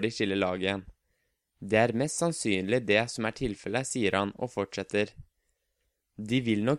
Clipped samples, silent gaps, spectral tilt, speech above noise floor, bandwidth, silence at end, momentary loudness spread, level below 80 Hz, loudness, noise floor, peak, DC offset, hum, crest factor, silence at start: under 0.1%; none; -4.5 dB/octave; 50 dB; 13.5 kHz; 0 s; 8 LU; -58 dBFS; -29 LUFS; -79 dBFS; -10 dBFS; under 0.1%; none; 20 dB; 0 s